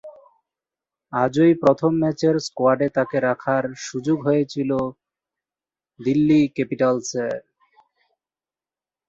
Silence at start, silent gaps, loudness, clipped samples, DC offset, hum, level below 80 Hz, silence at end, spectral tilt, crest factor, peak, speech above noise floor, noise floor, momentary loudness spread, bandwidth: 0.05 s; none; -21 LUFS; under 0.1%; under 0.1%; none; -62 dBFS; 1.7 s; -6.5 dB/octave; 18 dB; -4 dBFS; over 70 dB; under -90 dBFS; 11 LU; 8 kHz